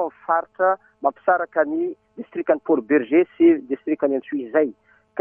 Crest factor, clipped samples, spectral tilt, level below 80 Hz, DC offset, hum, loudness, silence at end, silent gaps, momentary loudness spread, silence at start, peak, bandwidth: 16 dB; under 0.1%; -10 dB/octave; -68 dBFS; under 0.1%; none; -21 LUFS; 0 s; none; 10 LU; 0 s; -4 dBFS; 3.4 kHz